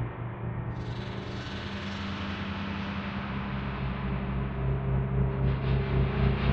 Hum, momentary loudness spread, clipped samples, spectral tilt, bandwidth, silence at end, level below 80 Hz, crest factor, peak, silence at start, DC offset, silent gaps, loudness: none; 8 LU; under 0.1%; -8 dB/octave; 6.8 kHz; 0 s; -36 dBFS; 18 dB; -12 dBFS; 0 s; under 0.1%; none; -32 LUFS